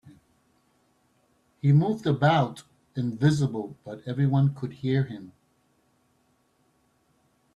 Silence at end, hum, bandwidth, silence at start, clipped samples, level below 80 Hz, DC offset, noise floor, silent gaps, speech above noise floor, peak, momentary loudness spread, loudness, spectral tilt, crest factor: 2.25 s; none; 9.6 kHz; 1.65 s; under 0.1%; -62 dBFS; under 0.1%; -68 dBFS; none; 44 dB; -8 dBFS; 16 LU; -26 LUFS; -8 dB/octave; 20 dB